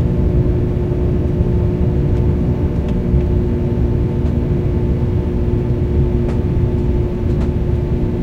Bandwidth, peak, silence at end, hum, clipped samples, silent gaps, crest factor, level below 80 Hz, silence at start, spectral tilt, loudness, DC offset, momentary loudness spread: 6 kHz; -2 dBFS; 0 s; none; under 0.1%; none; 14 dB; -20 dBFS; 0 s; -10.5 dB/octave; -17 LUFS; under 0.1%; 2 LU